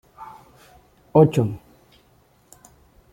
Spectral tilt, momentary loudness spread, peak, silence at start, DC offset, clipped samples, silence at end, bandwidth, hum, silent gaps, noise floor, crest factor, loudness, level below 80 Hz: -8.5 dB/octave; 26 LU; -2 dBFS; 0.2 s; under 0.1%; under 0.1%; 1.55 s; 16 kHz; none; none; -58 dBFS; 22 dB; -19 LUFS; -56 dBFS